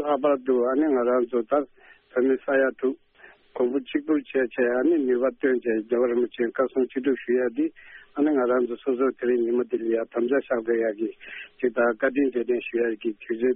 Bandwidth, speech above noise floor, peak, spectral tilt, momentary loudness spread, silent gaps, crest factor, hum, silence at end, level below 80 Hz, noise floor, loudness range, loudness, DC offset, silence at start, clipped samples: 3.8 kHz; 29 dB; -10 dBFS; -4 dB/octave; 7 LU; none; 16 dB; none; 0 s; -68 dBFS; -53 dBFS; 2 LU; -25 LUFS; under 0.1%; 0 s; under 0.1%